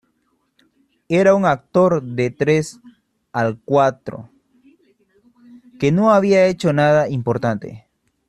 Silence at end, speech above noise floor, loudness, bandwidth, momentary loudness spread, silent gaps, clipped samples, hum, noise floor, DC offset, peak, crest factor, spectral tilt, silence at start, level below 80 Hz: 0.5 s; 50 dB; -17 LUFS; 11.5 kHz; 14 LU; none; under 0.1%; none; -67 dBFS; under 0.1%; -2 dBFS; 16 dB; -7 dB/octave; 1.1 s; -56 dBFS